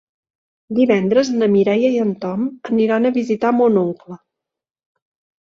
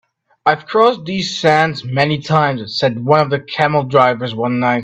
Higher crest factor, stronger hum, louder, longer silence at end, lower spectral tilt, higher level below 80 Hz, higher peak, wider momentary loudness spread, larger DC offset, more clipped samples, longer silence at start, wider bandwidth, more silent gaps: about the same, 16 dB vs 16 dB; neither; about the same, -17 LUFS vs -15 LUFS; first, 1.25 s vs 0 s; about the same, -7 dB/octave vs -6 dB/octave; second, -62 dBFS vs -54 dBFS; about the same, -2 dBFS vs 0 dBFS; about the same, 8 LU vs 6 LU; neither; neither; first, 0.7 s vs 0.45 s; second, 7.4 kHz vs 8.4 kHz; neither